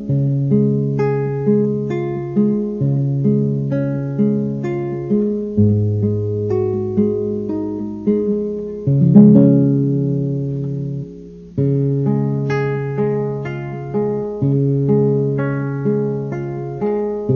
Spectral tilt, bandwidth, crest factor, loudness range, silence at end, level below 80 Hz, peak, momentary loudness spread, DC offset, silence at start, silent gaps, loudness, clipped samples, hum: -11 dB/octave; 3.5 kHz; 16 dB; 5 LU; 0 s; -48 dBFS; 0 dBFS; 8 LU; under 0.1%; 0 s; none; -18 LUFS; under 0.1%; none